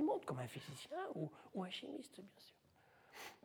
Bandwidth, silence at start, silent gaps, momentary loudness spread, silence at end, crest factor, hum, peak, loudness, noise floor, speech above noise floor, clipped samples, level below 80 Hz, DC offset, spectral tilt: over 20 kHz; 0 s; none; 17 LU; 0.05 s; 18 dB; none; -28 dBFS; -48 LUFS; -71 dBFS; 21 dB; under 0.1%; -86 dBFS; under 0.1%; -5.5 dB/octave